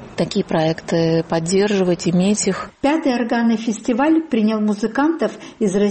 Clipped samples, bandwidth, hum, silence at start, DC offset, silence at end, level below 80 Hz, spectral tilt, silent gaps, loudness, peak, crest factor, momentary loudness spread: under 0.1%; 8.8 kHz; none; 0 s; under 0.1%; 0 s; -52 dBFS; -5.5 dB/octave; none; -18 LUFS; -4 dBFS; 14 dB; 5 LU